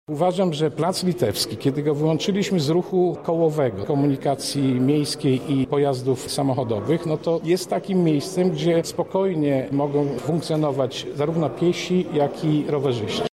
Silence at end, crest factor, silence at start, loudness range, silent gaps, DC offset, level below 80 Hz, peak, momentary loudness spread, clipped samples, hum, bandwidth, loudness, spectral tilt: 0.05 s; 14 dB; 0.1 s; 1 LU; none; under 0.1%; -58 dBFS; -8 dBFS; 3 LU; under 0.1%; none; 16 kHz; -22 LUFS; -6 dB/octave